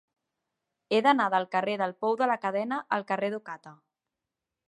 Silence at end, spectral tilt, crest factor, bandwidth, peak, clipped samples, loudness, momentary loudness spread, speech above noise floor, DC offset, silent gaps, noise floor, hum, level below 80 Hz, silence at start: 0.95 s; -5.5 dB/octave; 20 dB; 11.5 kHz; -10 dBFS; under 0.1%; -28 LUFS; 10 LU; 60 dB; under 0.1%; none; -88 dBFS; none; -84 dBFS; 0.9 s